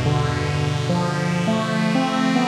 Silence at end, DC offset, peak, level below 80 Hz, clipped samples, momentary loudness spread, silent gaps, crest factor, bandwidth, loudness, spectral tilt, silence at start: 0 s; under 0.1%; -6 dBFS; -42 dBFS; under 0.1%; 2 LU; none; 14 dB; 12.5 kHz; -21 LUFS; -6 dB/octave; 0 s